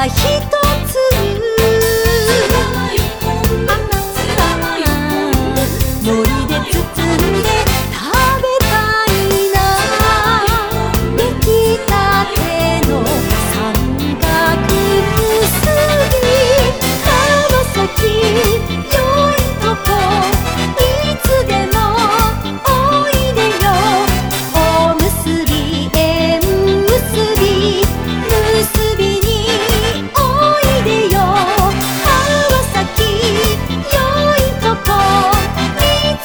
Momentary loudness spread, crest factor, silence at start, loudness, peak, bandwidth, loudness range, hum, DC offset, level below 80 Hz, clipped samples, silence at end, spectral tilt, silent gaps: 4 LU; 12 dB; 0 s; -13 LUFS; 0 dBFS; over 20 kHz; 2 LU; none; 0.3%; -22 dBFS; under 0.1%; 0 s; -4.5 dB/octave; none